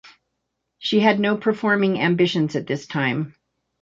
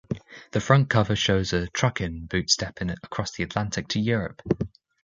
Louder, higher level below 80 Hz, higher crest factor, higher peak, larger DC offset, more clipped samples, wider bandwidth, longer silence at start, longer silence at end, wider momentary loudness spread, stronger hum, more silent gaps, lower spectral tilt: first, -21 LUFS vs -25 LUFS; second, -64 dBFS vs -44 dBFS; about the same, 20 dB vs 22 dB; about the same, -2 dBFS vs -2 dBFS; neither; neither; second, 7.6 kHz vs 8.8 kHz; about the same, 0.05 s vs 0.1 s; first, 0.5 s vs 0.35 s; about the same, 9 LU vs 11 LU; neither; neither; first, -6.5 dB/octave vs -4.5 dB/octave